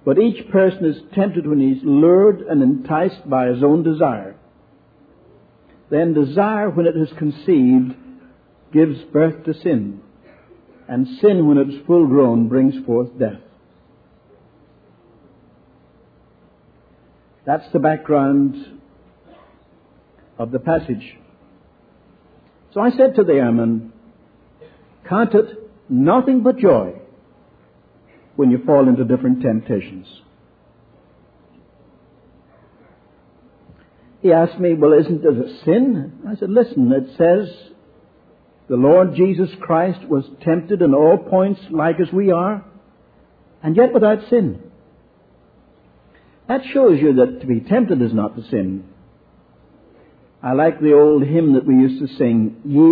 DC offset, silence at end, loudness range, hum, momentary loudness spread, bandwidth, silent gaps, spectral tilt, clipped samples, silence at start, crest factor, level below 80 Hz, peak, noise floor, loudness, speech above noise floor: under 0.1%; 0 s; 7 LU; none; 11 LU; 4.9 kHz; none; -12 dB/octave; under 0.1%; 0.05 s; 16 dB; -58 dBFS; -2 dBFS; -52 dBFS; -16 LUFS; 37 dB